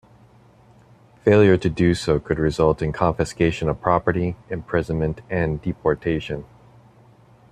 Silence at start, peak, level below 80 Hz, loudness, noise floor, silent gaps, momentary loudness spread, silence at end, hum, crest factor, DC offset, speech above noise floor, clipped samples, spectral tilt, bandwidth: 1.25 s; -2 dBFS; -42 dBFS; -21 LUFS; -52 dBFS; none; 9 LU; 1.1 s; none; 20 dB; under 0.1%; 31 dB; under 0.1%; -7 dB/octave; 11 kHz